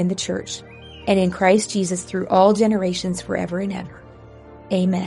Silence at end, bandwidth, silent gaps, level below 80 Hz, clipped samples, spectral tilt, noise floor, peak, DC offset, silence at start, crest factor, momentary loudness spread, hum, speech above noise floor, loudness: 0 s; 11.5 kHz; none; -50 dBFS; under 0.1%; -5.5 dB/octave; -42 dBFS; -2 dBFS; under 0.1%; 0 s; 18 dB; 16 LU; none; 23 dB; -20 LUFS